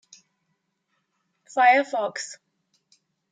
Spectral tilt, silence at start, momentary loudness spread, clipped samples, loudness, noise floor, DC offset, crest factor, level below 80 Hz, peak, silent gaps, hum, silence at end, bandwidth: -1.5 dB/octave; 1.55 s; 17 LU; under 0.1%; -22 LUFS; -76 dBFS; under 0.1%; 20 dB; under -90 dBFS; -6 dBFS; none; none; 0.95 s; 9.4 kHz